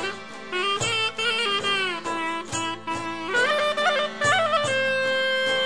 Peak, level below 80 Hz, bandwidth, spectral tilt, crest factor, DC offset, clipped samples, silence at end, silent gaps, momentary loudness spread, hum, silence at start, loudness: -10 dBFS; -60 dBFS; 11 kHz; -2 dB/octave; 16 dB; 0.5%; under 0.1%; 0 s; none; 8 LU; none; 0 s; -23 LUFS